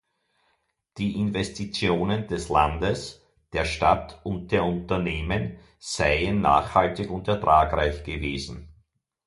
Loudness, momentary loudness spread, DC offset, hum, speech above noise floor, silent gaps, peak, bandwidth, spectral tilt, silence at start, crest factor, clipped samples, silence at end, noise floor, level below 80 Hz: -25 LUFS; 13 LU; under 0.1%; none; 47 dB; none; -4 dBFS; 11.5 kHz; -5.5 dB/octave; 0.95 s; 22 dB; under 0.1%; 0.55 s; -72 dBFS; -40 dBFS